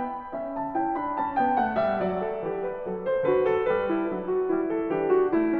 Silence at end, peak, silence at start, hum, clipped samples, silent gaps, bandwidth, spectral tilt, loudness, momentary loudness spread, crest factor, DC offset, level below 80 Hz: 0 s; -12 dBFS; 0 s; none; under 0.1%; none; 4.8 kHz; -9.5 dB/octave; -26 LUFS; 8 LU; 14 dB; under 0.1%; -56 dBFS